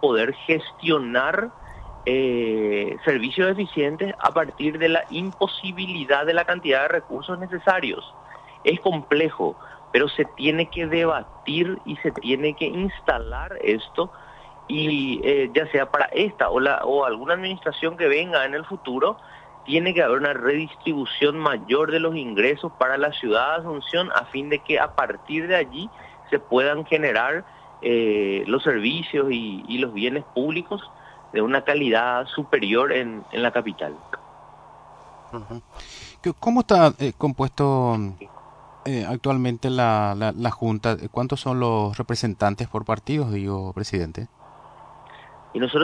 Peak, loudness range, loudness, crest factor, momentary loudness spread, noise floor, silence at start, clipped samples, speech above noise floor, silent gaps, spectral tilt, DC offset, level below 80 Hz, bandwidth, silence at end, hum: -4 dBFS; 3 LU; -23 LUFS; 20 dB; 10 LU; -46 dBFS; 0 s; under 0.1%; 24 dB; none; -6 dB/octave; under 0.1%; -50 dBFS; 10.5 kHz; 0 s; none